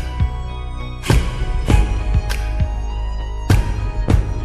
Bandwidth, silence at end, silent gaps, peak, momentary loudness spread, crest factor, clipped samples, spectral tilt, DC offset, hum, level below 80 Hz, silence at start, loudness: 13.5 kHz; 0 s; none; -2 dBFS; 10 LU; 16 dB; under 0.1%; -6 dB/octave; under 0.1%; none; -20 dBFS; 0 s; -21 LUFS